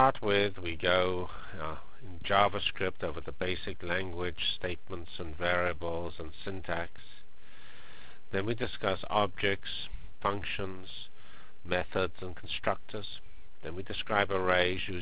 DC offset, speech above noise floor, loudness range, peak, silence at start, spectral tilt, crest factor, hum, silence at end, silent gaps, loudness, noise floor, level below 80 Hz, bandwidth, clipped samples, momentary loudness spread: 2%; 24 dB; 5 LU; -8 dBFS; 0 s; -2.5 dB/octave; 26 dB; none; 0 s; none; -33 LUFS; -57 dBFS; -50 dBFS; 4 kHz; under 0.1%; 16 LU